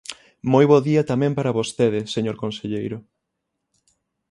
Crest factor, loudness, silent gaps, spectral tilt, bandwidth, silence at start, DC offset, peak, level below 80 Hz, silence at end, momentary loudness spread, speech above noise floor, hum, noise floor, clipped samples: 20 dB; -21 LUFS; none; -6.5 dB/octave; 11.5 kHz; 0.1 s; under 0.1%; -2 dBFS; -60 dBFS; 1.3 s; 15 LU; 59 dB; none; -79 dBFS; under 0.1%